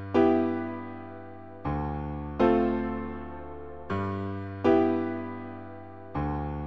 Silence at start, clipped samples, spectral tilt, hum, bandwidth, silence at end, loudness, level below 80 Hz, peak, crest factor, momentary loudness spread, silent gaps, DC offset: 0 s; under 0.1%; -9 dB/octave; none; 6.2 kHz; 0 s; -29 LUFS; -44 dBFS; -10 dBFS; 20 dB; 19 LU; none; 0.3%